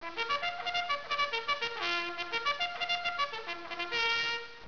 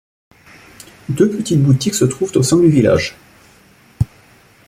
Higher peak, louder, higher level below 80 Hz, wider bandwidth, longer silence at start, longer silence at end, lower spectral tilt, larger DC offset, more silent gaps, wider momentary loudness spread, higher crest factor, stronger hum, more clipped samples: second, -18 dBFS vs -2 dBFS; second, -32 LUFS vs -15 LUFS; second, -66 dBFS vs -42 dBFS; second, 5.4 kHz vs 15.5 kHz; second, 0 s vs 1.1 s; second, 0 s vs 0.65 s; second, -1.5 dB/octave vs -6 dB/octave; first, 0.3% vs under 0.1%; neither; second, 5 LU vs 12 LU; about the same, 16 dB vs 14 dB; neither; neither